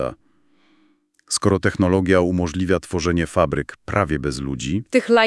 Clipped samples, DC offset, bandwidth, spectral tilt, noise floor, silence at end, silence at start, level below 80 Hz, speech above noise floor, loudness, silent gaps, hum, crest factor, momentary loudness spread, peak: under 0.1%; under 0.1%; 12 kHz; -5.5 dB/octave; -61 dBFS; 0 s; 0 s; -42 dBFS; 42 dB; -20 LUFS; none; none; 20 dB; 8 LU; 0 dBFS